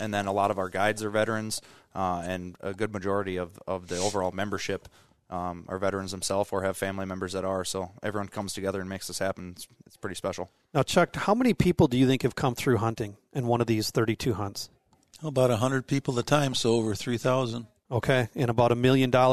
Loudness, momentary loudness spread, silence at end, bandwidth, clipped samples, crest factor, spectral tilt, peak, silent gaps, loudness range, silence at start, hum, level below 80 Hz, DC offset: -28 LUFS; 12 LU; 0 s; 13.5 kHz; under 0.1%; 20 dB; -5.5 dB/octave; -8 dBFS; none; 6 LU; 0 s; none; -54 dBFS; 0.2%